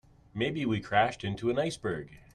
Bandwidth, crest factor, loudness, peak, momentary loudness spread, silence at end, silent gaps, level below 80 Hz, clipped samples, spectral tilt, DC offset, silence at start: 12 kHz; 20 dB; -31 LUFS; -10 dBFS; 9 LU; 0.15 s; none; -58 dBFS; under 0.1%; -5.5 dB/octave; under 0.1%; 0.35 s